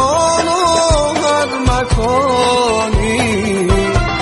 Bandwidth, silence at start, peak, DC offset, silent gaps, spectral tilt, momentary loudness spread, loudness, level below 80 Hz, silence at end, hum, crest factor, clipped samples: 11.5 kHz; 0 s; -2 dBFS; under 0.1%; none; -4.5 dB/octave; 3 LU; -14 LUFS; -22 dBFS; 0 s; none; 12 dB; under 0.1%